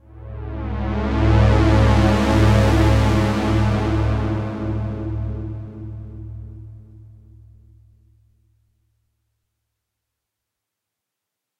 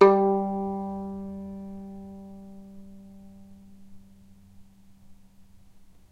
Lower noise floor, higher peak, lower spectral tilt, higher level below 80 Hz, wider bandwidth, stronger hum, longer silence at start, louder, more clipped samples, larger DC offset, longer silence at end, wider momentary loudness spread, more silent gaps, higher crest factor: first, -83 dBFS vs -52 dBFS; about the same, -2 dBFS vs -2 dBFS; about the same, -7.5 dB/octave vs -8.5 dB/octave; first, -26 dBFS vs -60 dBFS; first, 11 kHz vs 5.6 kHz; neither; first, 0.15 s vs 0 s; first, -18 LUFS vs -28 LUFS; neither; neither; first, 4.8 s vs 0.25 s; second, 20 LU vs 26 LU; neither; second, 18 dB vs 28 dB